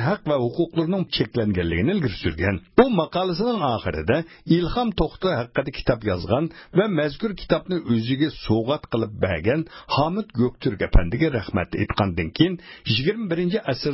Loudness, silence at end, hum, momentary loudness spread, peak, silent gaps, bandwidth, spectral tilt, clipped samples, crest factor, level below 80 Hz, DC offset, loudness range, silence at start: -23 LUFS; 0 s; none; 4 LU; -4 dBFS; none; 5.8 kHz; -10.5 dB/octave; under 0.1%; 20 dB; -34 dBFS; under 0.1%; 2 LU; 0 s